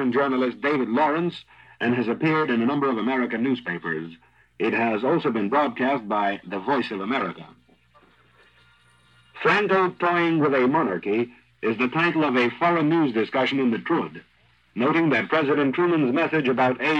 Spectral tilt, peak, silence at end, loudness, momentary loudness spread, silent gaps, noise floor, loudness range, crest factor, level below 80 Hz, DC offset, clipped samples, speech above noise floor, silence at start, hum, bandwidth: -7.5 dB/octave; -8 dBFS; 0 s; -23 LUFS; 8 LU; none; -58 dBFS; 4 LU; 16 dB; -70 dBFS; under 0.1%; under 0.1%; 35 dB; 0 s; 60 Hz at -60 dBFS; 8 kHz